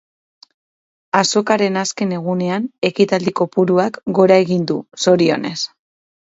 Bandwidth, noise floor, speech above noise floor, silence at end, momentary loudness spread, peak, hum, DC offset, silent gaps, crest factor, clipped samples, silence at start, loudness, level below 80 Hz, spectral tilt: 8 kHz; under -90 dBFS; over 74 dB; 0.65 s; 8 LU; 0 dBFS; none; under 0.1%; 2.78-2.82 s; 18 dB; under 0.1%; 1.15 s; -17 LUFS; -62 dBFS; -5 dB/octave